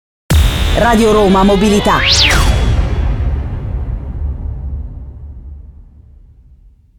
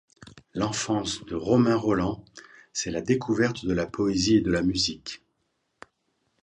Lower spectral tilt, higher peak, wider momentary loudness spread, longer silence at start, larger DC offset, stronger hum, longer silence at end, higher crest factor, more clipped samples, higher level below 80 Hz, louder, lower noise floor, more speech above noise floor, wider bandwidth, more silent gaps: about the same, -5 dB/octave vs -5 dB/octave; first, 0 dBFS vs -8 dBFS; first, 20 LU vs 14 LU; about the same, 0.3 s vs 0.25 s; neither; neither; second, 1.15 s vs 1.3 s; about the same, 14 dB vs 18 dB; neither; first, -18 dBFS vs -50 dBFS; first, -12 LUFS vs -25 LUFS; second, -43 dBFS vs -75 dBFS; second, 34 dB vs 50 dB; first, 19.5 kHz vs 10.5 kHz; neither